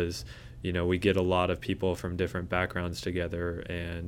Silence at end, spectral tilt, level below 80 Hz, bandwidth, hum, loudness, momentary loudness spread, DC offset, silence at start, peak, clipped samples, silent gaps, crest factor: 0 s; -6 dB/octave; -46 dBFS; 16.5 kHz; none; -31 LUFS; 9 LU; under 0.1%; 0 s; -10 dBFS; under 0.1%; none; 20 dB